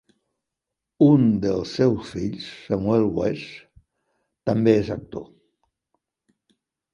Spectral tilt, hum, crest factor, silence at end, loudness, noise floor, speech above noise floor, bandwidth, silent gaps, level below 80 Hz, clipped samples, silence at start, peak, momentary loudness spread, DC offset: -8 dB/octave; none; 20 dB; 1.7 s; -22 LUFS; -85 dBFS; 64 dB; 10.5 kHz; none; -52 dBFS; under 0.1%; 1 s; -4 dBFS; 17 LU; under 0.1%